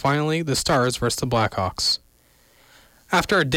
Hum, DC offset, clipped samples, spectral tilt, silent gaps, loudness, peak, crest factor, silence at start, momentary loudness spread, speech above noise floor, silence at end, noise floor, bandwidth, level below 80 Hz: none; under 0.1%; under 0.1%; -4 dB/octave; none; -22 LUFS; -10 dBFS; 14 dB; 0 s; 4 LU; 36 dB; 0 s; -57 dBFS; 17 kHz; -46 dBFS